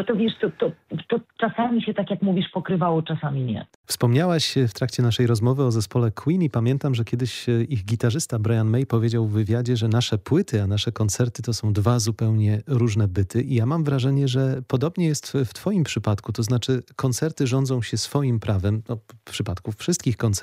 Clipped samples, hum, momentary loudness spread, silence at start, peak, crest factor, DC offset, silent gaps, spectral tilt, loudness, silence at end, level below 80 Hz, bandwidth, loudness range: under 0.1%; none; 6 LU; 0 s; -6 dBFS; 16 dB; under 0.1%; 3.75-3.84 s; -6 dB/octave; -23 LUFS; 0 s; -54 dBFS; 15 kHz; 2 LU